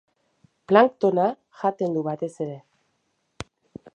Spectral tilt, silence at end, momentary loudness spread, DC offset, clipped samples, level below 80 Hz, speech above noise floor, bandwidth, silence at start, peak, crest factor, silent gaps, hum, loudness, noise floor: -7 dB/octave; 1.35 s; 23 LU; under 0.1%; under 0.1%; -62 dBFS; 51 dB; 9.8 kHz; 0.7 s; -2 dBFS; 24 dB; none; none; -23 LUFS; -72 dBFS